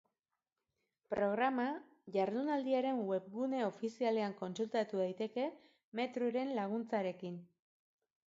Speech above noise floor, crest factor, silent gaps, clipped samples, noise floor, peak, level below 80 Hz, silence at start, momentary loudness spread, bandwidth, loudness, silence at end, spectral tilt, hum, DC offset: over 53 dB; 16 dB; 5.84-5.92 s; under 0.1%; under -90 dBFS; -22 dBFS; -82 dBFS; 1.1 s; 8 LU; 7.6 kHz; -38 LUFS; 0.85 s; -4.5 dB/octave; none; under 0.1%